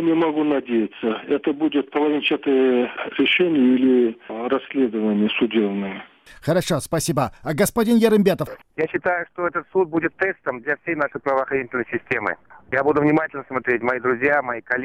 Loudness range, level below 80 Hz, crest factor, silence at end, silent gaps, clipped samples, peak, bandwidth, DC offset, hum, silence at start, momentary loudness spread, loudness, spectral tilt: 4 LU; -54 dBFS; 16 dB; 0 s; none; under 0.1%; -4 dBFS; 16 kHz; under 0.1%; none; 0 s; 9 LU; -21 LUFS; -5 dB/octave